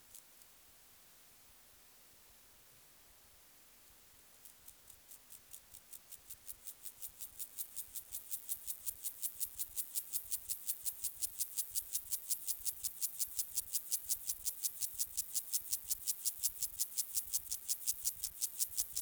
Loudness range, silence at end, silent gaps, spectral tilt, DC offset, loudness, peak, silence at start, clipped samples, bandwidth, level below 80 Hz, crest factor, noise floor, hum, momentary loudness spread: 22 LU; 0 s; none; 2 dB/octave; under 0.1%; -38 LUFS; -18 dBFS; 0 s; under 0.1%; over 20 kHz; -72 dBFS; 24 dB; -63 dBFS; none; 23 LU